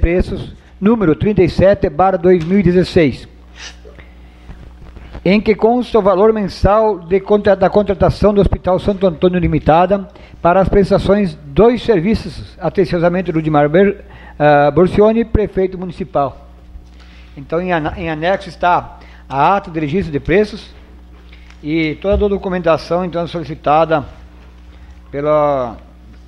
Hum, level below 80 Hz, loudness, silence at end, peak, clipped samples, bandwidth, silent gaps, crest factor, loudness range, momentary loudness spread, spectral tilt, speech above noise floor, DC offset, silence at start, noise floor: none; -30 dBFS; -14 LUFS; 0.1 s; 0 dBFS; under 0.1%; 10.5 kHz; none; 14 dB; 5 LU; 11 LU; -8 dB/octave; 24 dB; under 0.1%; 0 s; -38 dBFS